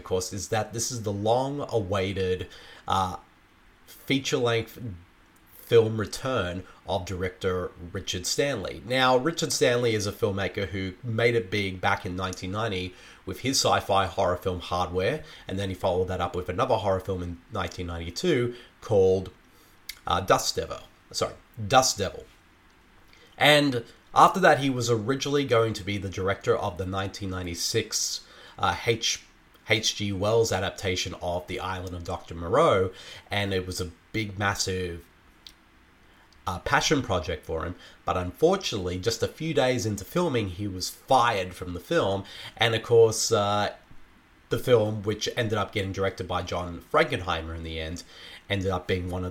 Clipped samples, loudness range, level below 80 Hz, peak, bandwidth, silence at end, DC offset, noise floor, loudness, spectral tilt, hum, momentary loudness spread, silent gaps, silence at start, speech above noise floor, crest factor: under 0.1%; 5 LU; -50 dBFS; -4 dBFS; 17 kHz; 0 s; under 0.1%; -57 dBFS; -26 LUFS; -4 dB/octave; none; 13 LU; none; 0 s; 31 dB; 24 dB